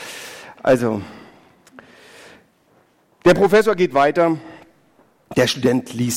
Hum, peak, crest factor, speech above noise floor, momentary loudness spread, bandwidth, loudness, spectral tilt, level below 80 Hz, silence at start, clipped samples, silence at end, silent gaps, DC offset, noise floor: none; 0 dBFS; 20 dB; 41 dB; 17 LU; 16.5 kHz; -17 LUFS; -5 dB/octave; -52 dBFS; 0 s; under 0.1%; 0 s; none; under 0.1%; -58 dBFS